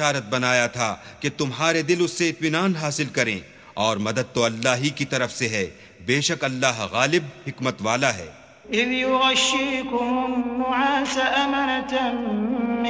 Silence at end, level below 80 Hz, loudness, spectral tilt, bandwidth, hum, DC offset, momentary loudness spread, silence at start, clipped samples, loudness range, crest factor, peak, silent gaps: 0 s; -56 dBFS; -22 LUFS; -3.5 dB/octave; 8 kHz; none; under 0.1%; 6 LU; 0 s; under 0.1%; 2 LU; 22 dB; -2 dBFS; none